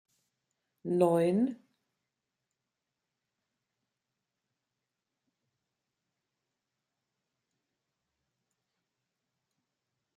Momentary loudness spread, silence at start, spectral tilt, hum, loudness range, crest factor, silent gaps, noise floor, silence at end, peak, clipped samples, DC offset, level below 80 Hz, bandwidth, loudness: 9 LU; 0.85 s; -8 dB/octave; none; 5 LU; 26 dB; none; -88 dBFS; 8.6 s; -14 dBFS; under 0.1%; under 0.1%; -84 dBFS; 13.5 kHz; -29 LUFS